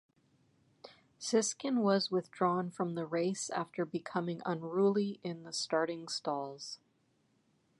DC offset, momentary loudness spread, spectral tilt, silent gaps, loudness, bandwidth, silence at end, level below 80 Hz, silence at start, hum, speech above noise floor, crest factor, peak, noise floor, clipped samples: under 0.1%; 10 LU; -4.5 dB/octave; none; -35 LUFS; 11.5 kHz; 1.05 s; -86 dBFS; 0.85 s; none; 40 dB; 20 dB; -16 dBFS; -74 dBFS; under 0.1%